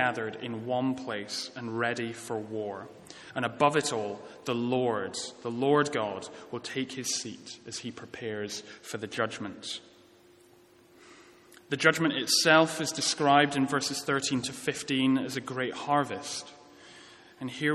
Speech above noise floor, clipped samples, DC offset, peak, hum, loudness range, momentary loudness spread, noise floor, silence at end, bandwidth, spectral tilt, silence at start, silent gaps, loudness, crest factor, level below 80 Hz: 29 dB; under 0.1%; under 0.1%; -6 dBFS; none; 12 LU; 16 LU; -59 dBFS; 0 s; 14 kHz; -3.5 dB/octave; 0 s; none; -29 LUFS; 24 dB; -74 dBFS